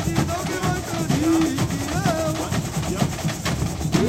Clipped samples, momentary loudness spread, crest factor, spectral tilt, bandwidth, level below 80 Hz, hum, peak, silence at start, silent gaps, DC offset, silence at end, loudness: under 0.1%; 5 LU; 16 dB; -5 dB/octave; 16 kHz; -38 dBFS; none; -6 dBFS; 0 s; none; under 0.1%; 0 s; -23 LUFS